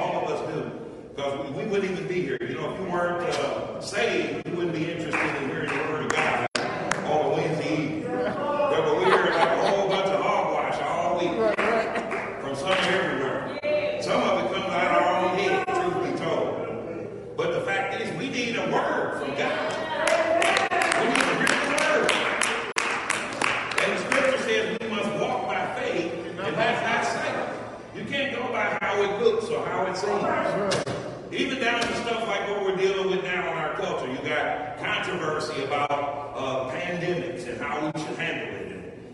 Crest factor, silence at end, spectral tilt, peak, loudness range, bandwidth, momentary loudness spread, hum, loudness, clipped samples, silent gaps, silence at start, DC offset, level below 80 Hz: 22 dB; 0 s; -4 dB/octave; -2 dBFS; 5 LU; 11.5 kHz; 9 LU; none; -25 LUFS; under 0.1%; none; 0 s; under 0.1%; -58 dBFS